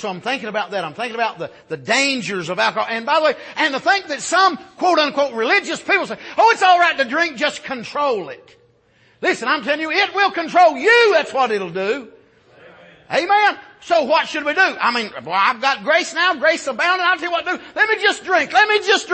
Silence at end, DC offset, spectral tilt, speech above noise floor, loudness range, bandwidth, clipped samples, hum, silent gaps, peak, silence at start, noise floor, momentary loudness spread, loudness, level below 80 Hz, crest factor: 0 s; under 0.1%; -2.5 dB/octave; 38 dB; 4 LU; 8.8 kHz; under 0.1%; none; none; -2 dBFS; 0 s; -56 dBFS; 10 LU; -17 LUFS; -66 dBFS; 16 dB